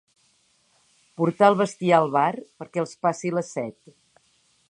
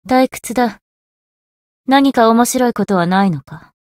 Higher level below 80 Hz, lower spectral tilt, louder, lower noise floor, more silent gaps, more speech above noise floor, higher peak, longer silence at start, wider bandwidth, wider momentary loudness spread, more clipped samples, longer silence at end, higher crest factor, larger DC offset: second, -76 dBFS vs -54 dBFS; about the same, -6 dB/octave vs -5 dB/octave; second, -23 LUFS vs -14 LUFS; second, -65 dBFS vs under -90 dBFS; second, none vs 0.81-1.84 s; second, 42 dB vs over 76 dB; about the same, -2 dBFS vs 0 dBFS; first, 1.2 s vs 0.05 s; second, 11 kHz vs 16.5 kHz; first, 13 LU vs 8 LU; neither; first, 1 s vs 0.25 s; first, 22 dB vs 16 dB; neither